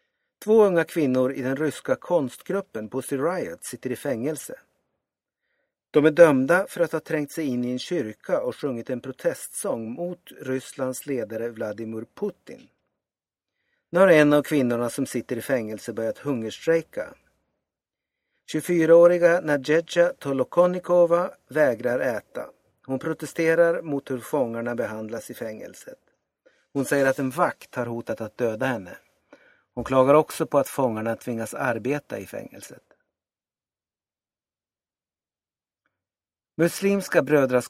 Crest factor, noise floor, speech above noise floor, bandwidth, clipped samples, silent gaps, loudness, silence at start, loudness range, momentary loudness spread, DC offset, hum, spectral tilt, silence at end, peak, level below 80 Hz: 24 dB; under -90 dBFS; over 67 dB; 15.5 kHz; under 0.1%; none; -24 LUFS; 0.4 s; 9 LU; 16 LU; under 0.1%; none; -5.5 dB/octave; 0 s; -2 dBFS; -66 dBFS